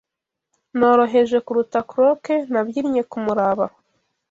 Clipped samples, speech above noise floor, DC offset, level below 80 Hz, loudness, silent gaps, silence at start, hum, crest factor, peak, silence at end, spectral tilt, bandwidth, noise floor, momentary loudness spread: under 0.1%; 65 dB; under 0.1%; -62 dBFS; -19 LUFS; none; 0.75 s; none; 16 dB; -4 dBFS; 0.6 s; -6.5 dB/octave; 7.6 kHz; -83 dBFS; 8 LU